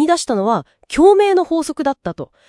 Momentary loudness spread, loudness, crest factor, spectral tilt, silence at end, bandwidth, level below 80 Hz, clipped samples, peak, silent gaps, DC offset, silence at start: 13 LU; -16 LUFS; 14 dB; -4.5 dB/octave; 0.25 s; 12 kHz; -46 dBFS; under 0.1%; 0 dBFS; none; under 0.1%; 0 s